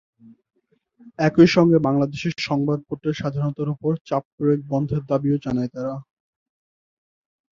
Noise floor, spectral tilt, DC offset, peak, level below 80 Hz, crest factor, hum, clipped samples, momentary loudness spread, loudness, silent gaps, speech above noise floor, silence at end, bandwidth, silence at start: -58 dBFS; -7.5 dB/octave; under 0.1%; -2 dBFS; -56 dBFS; 20 dB; none; under 0.1%; 12 LU; -21 LUFS; 4.01-4.05 s, 4.25-4.38 s; 37 dB; 1.55 s; 7.4 kHz; 1.05 s